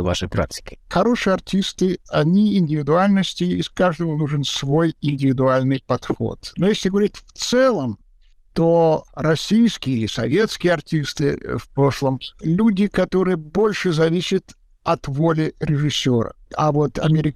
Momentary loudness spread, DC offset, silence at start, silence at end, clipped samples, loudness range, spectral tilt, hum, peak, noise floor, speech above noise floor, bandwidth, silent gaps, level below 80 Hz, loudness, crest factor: 8 LU; under 0.1%; 0 s; 0 s; under 0.1%; 2 LU; -6 dB/octave; none; -8 dBFS; -52 dBFS; 33 dB; 14 kHz; none; -44 dBFS; -20 LUFS; 12 dB